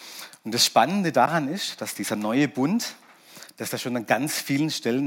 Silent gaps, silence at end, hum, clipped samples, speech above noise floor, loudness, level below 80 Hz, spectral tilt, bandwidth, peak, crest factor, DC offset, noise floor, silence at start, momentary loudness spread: none; 0 s; none; under 0.1%; 24 dB; -24 LUFS; -78 dBFS; -3.5 dB/octave; 17 kHz; -4 dBFS; 20 dB; under 0.1%; -48 dBFS; 0 s; 14 LU